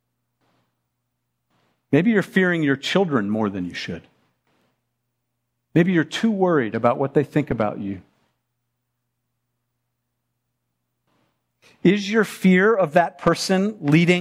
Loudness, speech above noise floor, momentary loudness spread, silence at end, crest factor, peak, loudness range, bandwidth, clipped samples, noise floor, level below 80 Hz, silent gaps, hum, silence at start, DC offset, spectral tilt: -20 LUFS; 57 dB; 11 LU; 0 s; 20 dB; -2 dBFS; 8 LU; 14.5 kHz; under 0.1%; -77 dBFS; -56 dBFS; none; none; 1.9 s; under 0.1%; -6.5 dB/octave